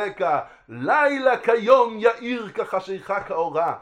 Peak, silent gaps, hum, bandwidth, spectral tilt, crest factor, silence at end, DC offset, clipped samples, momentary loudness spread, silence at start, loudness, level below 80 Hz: -2 dBFS; none; none; 9.6 kHz; -5.5 dB/octave; 20 dB; 0 s; under 0.1%; under 0.1%; 11 LU; 0 s; -21 LUFS; -64 dBFS